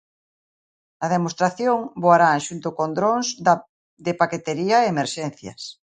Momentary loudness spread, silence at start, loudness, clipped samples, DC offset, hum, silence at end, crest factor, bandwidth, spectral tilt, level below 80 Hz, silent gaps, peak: 13 LU; 1 s; -21 LUFS; under 0.1%; under 0.1%; none; 0.15 s; 20 dB; 9.4 kHz; -4.5 dB/octave; -66 dBFS; 3.69-3.97 s; -2 dBFS